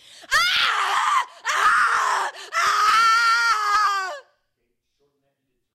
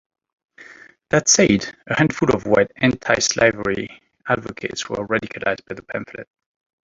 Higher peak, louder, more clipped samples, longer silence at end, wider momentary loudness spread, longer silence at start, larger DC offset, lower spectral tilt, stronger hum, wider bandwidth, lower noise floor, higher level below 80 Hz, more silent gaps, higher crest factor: second, -6 dBFS vs -2 dBFS; about the same, -19 LUFS vs -19 LUFS; neither; first, 1.55 s vs 0.65 s; second, 9 LU vs 15 LU; second, 0.2 s vs 0.6 s; neither; second, 2 dB/octave vs -3.5 dB/octave; neither; first, 16 kHz vs 7.8 kHz; first, -74 dBFS vs -45 dBFS; second, -60 dBFS vs -50 dBFS; neither; second, 14 dB vs 20 dB